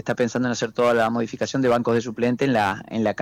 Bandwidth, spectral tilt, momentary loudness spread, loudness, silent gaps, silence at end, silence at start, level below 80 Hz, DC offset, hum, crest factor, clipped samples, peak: 15.5 kHz; -5.5 dB/octave; 5 LU; -22 LUFS; none; 0 s; 0.05 s; -58 dBFS; under 0.1%; none; 10 dB; under 0.1%; -12 dBFS